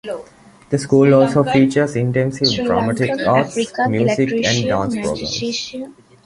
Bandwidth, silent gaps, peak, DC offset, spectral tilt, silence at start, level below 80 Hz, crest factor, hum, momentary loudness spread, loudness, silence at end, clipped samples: 11.5 kHz; none; -2 dBFS; under 0.1%; -5.5 dB/octave; 0.05 s; -48 dBFS; 16 dB; none; 11 LU; -17 LUFS; 0.35 s; under 0.1%